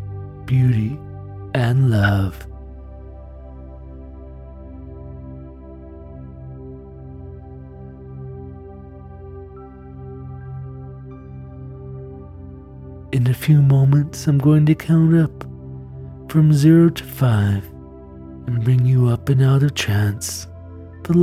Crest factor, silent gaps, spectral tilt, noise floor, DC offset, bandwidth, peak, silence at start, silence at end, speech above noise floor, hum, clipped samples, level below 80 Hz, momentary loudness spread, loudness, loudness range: 16 dB; none; -7 dB/octave; -38 dBFS; under 0.1%; 15 kHz; -4 dBFS; 0 s; 0 s; 22 dB; none; under 0.1%; -42 dBFS; 24 LU; -17 LUFS; 21 LU